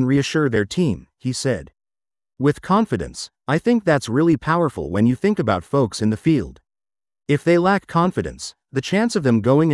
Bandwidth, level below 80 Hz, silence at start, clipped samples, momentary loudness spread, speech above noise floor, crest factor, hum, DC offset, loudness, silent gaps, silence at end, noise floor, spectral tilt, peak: 12 kHz; -48 dBFS; 0 s; under 0.1%; 10 LU; over 71 dB; 16 dB; none; under 0.1%; -20 LUFS; none; 0 s; under -90 dBFS; -6.5 dB/octave; -4 dBFS